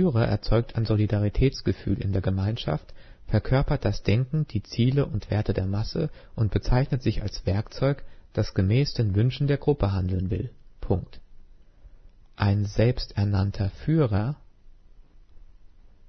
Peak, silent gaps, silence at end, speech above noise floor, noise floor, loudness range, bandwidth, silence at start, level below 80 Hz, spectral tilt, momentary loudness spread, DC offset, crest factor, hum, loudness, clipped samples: -6 dBFS; none; 0.4 s; 26 dB; -50 dBFS; 3 LU; 6.4 kHz; 0 s; -36 dBFS; -8 dB/octave; 7 LU; under 0.1%; 18 dB; none; -26 LUFS; under 0.1%